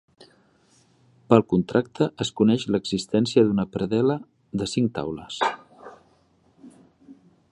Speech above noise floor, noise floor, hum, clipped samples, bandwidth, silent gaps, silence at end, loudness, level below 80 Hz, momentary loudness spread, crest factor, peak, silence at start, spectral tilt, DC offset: 39 dB; -62 dBFS; none; under 0.1%; 11 kHz; none; 0.4 s; -23 LUFS; -56 dBFS; 11 LU; 24 dB; -2 dBFS; 1.3 s; -6 dB/octave; under 0.1%